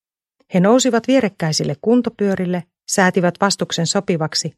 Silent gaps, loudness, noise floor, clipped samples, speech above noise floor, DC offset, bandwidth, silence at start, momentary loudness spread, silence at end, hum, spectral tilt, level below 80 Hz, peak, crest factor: none; -17 LUFS; -66 dBFS; under 0.1%; 49 dB; under 0.1%; 14 kHz; 0.5 s; 7 LU; 0.1 s; none; -4.5 dB/octave; -60 dBFS; 0 dBFS; 18 dB